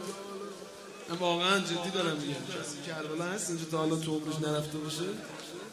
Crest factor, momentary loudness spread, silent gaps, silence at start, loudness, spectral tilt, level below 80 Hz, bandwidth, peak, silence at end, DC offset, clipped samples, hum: 18 dB; 14 LU; none; 0 s; -33 LUFS; -4 dB/octave; -70 dBFS; 16 kHz; -16 dBFS; 0 s; under 0.1%; under 0.1%; none